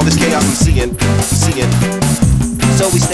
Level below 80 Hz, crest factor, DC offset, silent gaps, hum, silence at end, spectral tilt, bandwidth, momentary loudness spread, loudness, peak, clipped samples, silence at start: -22 dBFS; 12 dB; under 0.1%; none; none; 0 s; -5 dB/octave; 11 kHz; 2 LU; -12 LUFS; 0 dBFS; under 0.1%; 0 s